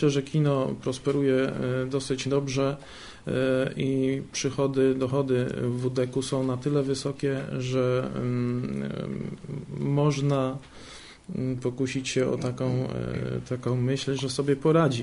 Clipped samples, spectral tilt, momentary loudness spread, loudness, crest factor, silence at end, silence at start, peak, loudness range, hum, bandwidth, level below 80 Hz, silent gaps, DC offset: under 0.1%; -6.5 dB/octave; 9 LU; -27 LUFS; 18 dB; 0 s; 0 s; -10 dBFS; 3 LU; none; 11 kHz; -54 dBFS; none; under 0.1%